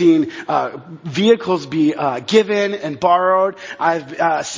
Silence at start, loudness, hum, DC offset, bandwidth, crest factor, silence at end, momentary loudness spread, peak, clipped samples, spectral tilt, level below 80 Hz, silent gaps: 0 s; -17 LUFS; none; under 0.1%; 7.6 kHz; 16 dB; 0 s; 7 LU; 0 dBFS; under 0.1%; -5 dB/octave; -62 dBFS; none